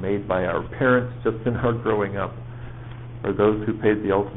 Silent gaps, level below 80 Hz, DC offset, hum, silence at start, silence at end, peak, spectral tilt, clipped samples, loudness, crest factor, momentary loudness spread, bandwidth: none; -44 dBFS; 0.4%; none; 0 s; 0 s; -6 dBFS; -6.5 dB/octave; under 0.1%; -23 LUFS; 18 dB; 17 LU; 4 kHz